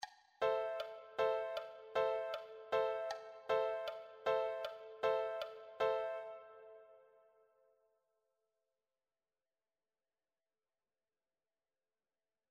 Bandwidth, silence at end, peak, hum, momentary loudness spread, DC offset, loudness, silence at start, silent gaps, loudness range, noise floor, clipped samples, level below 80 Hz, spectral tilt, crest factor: 15 kHz; 5.55 s; -24 dBFS; none; 11 LU; under 0.1%; -40 LUFS; 0 s; none; 6 LU; under -90 dBFS; under 0.1%; -82 dBFS; -3 dB/octave; 20 dB